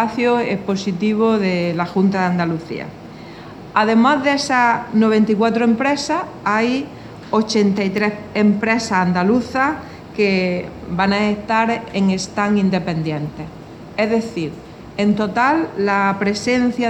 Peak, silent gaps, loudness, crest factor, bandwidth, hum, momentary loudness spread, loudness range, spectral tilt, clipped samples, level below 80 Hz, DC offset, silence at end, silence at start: -2 dBFS; none; -18 LUFS; 16 dB; 10.5 kHz; none; 14 LU; 4 LU; -6 dB/octave; under 0.1%; -50 dBFS; under 0.1%; 0 s; 0 s